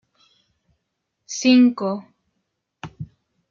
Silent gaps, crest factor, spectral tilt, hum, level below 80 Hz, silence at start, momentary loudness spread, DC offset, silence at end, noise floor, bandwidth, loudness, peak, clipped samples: none; 18 dB; -4.5 dB/octave; none; -62 dBFS; 1.3 s; 25 LU; under 0.1%; 0.45 s; -77 dBFS; 7.4 kHz; -18 LUFS; -6 dBFS; under 0.1%